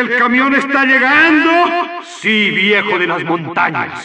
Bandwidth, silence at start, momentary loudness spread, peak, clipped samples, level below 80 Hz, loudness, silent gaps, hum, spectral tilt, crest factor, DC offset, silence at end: 9.4 kHz; 0 s; 9 LU; -2 dBFS; under 0.1%; -62 dBFS; -12 LUFS; none; none; -4.5 dB/octave; 12 dB; under 0.1%; 0 s